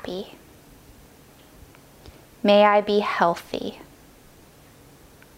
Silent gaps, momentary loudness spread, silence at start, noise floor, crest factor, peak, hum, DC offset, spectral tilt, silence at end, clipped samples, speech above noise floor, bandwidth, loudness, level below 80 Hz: none; 19 LU; 0.05 s; -51 dBFS; 22 dB; -4 dBFS; none; under 0.1%; -5.5 dB/octave; 1.6 s; under 0.1%; 30 dB; 16 kHz; -21 LUFS; -56 dBFS